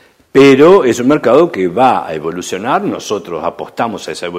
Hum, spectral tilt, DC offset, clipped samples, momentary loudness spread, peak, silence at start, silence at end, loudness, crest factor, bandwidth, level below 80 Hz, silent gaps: none; -5.5 dB/octave; under 0.1%; 0.5%; 14 LU; 0 dBFS; 0.35 s; 0 s; -12 LUFS; 12 dB; 15 kHz; -50 dBFS; none